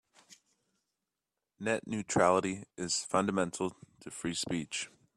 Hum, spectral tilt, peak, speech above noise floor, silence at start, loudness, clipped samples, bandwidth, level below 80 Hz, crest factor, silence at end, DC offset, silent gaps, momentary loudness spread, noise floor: none; -4 dB/octave; -12 dBFS; 56 dB; 0.3 s; -33 LUFS; under 0.1%; 13 kHz; -68 dBFS; 24 dB; 0.3 s; under 0.1%; none; 12 LU; -89 dBFS